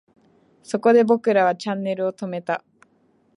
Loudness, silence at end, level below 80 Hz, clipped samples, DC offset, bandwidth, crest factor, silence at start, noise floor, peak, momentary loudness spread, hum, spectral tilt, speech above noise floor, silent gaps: -21 LUFS; 0.8 s; -76 dBFS; under 0.1%; under 0.1%; 11 kHz; 18 dB; 0.7 s; -62 dBFS; -4 dBFS; 13 LU; none; -6 dB/octave; 42 dB; none